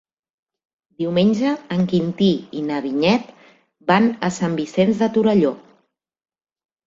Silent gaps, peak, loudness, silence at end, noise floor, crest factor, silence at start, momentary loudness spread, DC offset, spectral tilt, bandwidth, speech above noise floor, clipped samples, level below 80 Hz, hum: none; -2 dBFS; -19 LUFS; 1.25 s; -66 dBFS; 18 dB; 1 s; 8 LU; under 0.1%; -6.5 dB/octave; 7.8 kHz; 48 dB; under 0.1%; -58 dBFS; none